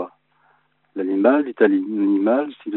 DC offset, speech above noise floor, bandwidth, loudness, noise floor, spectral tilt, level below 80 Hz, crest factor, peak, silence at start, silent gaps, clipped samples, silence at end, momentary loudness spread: under 0.1%; 43 dB; 4.1 kHz; -19 LUFS; -62 dBFS; -5.5 dB/octave; -76 dBFS; 18 dB; -2 dBFS; 0 s; none; under 0.1%; 0 s; 12 LU